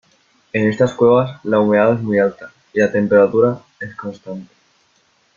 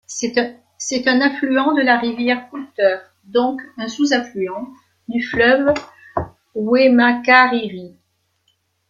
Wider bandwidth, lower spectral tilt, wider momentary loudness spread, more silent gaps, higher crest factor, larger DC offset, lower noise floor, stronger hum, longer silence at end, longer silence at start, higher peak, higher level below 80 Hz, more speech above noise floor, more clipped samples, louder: second, 7.2 kHz vs 9.2 kHz; first, -7.5 dB/octave vs -3.5 dB/octave; about the same, 17 LU vs 16 LU; neither; about the same, 16 dB vs 16 dB; neither; second, -59 dBFS vs -66 dBFS; neither; about the same, 0.95 s vs 1 s; first, 0.55 s vs 0.1 s; about the same, -2 dBFS vs -2 dBFS; about the same, -58 dBFS vs -54 dBFS; second, 44 dB vs 49 dB; neither; about the same, -16 LUFS vs -17 LUFS